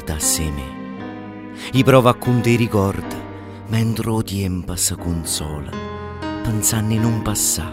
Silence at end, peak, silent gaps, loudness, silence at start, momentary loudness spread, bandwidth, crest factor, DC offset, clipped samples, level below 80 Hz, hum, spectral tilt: 0 s; 0 dBFS; none; -19 LUFS; 0 s; 16 LU; 16.5 kHz; 20 dB; under 0.1%; under 0.1%; -36 dBFS; none; -4.5 dB/octave